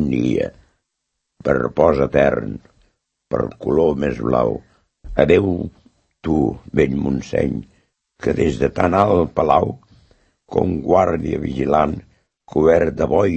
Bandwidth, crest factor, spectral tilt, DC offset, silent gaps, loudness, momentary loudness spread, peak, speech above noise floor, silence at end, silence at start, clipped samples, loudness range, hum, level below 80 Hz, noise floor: 8.4 kHz; 18 dB; -8 dB/octave; under 0.1%; none; -18 LUFS; 11 LU; 0 dBFS; 59 dB; 0 s; 0 s; under 0.1%; 2 LU; none; -38 dBFS; -76 dBFS